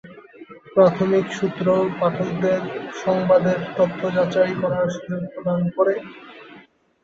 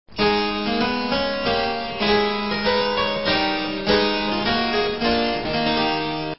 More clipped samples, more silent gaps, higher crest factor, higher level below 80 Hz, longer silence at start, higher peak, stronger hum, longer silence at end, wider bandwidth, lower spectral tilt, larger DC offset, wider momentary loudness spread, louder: neither; neither; about the same, 18 dB vs 16 dB; second, -60 dBFS vs -44 dBFS; about the same, 0.05 s vs 0.05 s; about the same, -4 dBFS vs -4 dBFS; neither; first, 0.45 s vs 0 s; first, 7.6 kHz vs 5.8 kHz; about the same, -7.5 dB/octave vs -8 dB/octave; second, under 0.1% vs 0.7%; first, 11 LU vs 3 LU; about the same, -21 LUFS vs -21 LUFS